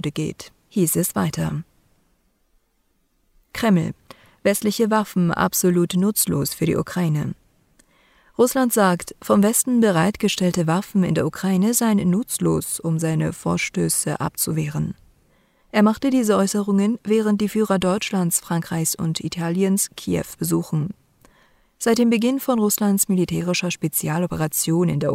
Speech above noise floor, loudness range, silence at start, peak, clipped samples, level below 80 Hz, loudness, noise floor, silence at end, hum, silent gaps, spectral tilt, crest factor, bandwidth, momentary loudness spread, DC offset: 46 dB; 5 LU; 0.05 s; -6 dBFS; under 0.1%; -54 dBFS; -21 LUFS; -66 dBFS; 0 s; none; none; -5 dB/octave; 16 dB; 16 kHz; 8 LU; under 0.1%